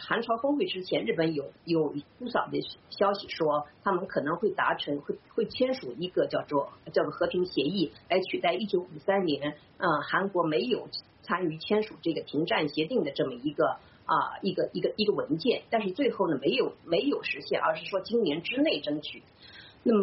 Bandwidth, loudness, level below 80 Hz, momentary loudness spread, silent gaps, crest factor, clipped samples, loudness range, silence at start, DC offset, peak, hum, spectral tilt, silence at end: 5.8 kHz; -29 LUFS; -68 dBFS; 6 LU; none; 16 dB; under 0.1%; 2 LU; 0 s; under 0.1%; -12 dBFS; none; -3.5 dB/octave; 0 s